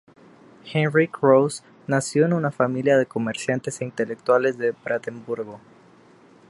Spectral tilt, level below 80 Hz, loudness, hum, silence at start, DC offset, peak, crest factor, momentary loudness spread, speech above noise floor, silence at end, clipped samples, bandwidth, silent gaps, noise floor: -6 dB/octave; -68 dBFS; -22 LUFS; none; 0.65 s; under 0.1%; -4 dBFS; 20 dB; 13 LU; 30 dB; 0.9 s; under 0.1%; 11.5 kHz; none; -52 dBFS